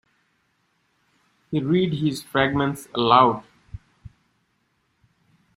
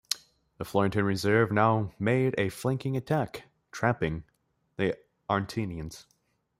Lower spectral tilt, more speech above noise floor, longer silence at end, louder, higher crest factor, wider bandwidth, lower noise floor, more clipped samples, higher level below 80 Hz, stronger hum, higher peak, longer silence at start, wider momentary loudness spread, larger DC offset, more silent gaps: about the same, -6 dB/octave vs -6 dB/octave; first, 49 dB vs 32 dB; first, 1.8 s vs 0.6 s; first, -21 LUFS vs -29 LUFS; about the same, 24 dB vs 22 dB; about the same, 16 kHz vs 16 kHz; first, -69 dBFS vs -60 dBFS; neither; about the same, -54 dBFS vs -56 dBFS; neither; first, -2 dBFS vs -8 dBFS; first, 1.5 s vs 0.1 s; first, 27 LU vs 16 LU; neither; neither